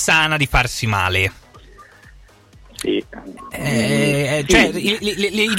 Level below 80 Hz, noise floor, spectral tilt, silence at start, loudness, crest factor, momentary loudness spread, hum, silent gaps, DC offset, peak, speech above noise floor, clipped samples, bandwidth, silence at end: -34 dBFS; -46 dBFS; -4 dB/octave; 0 s; -17 LUFS; 18 dB; 12 LU; none; none; under 0.1%; 0 dBFS; 28 dB; under 0.1%; 16.5 kHz; 0 s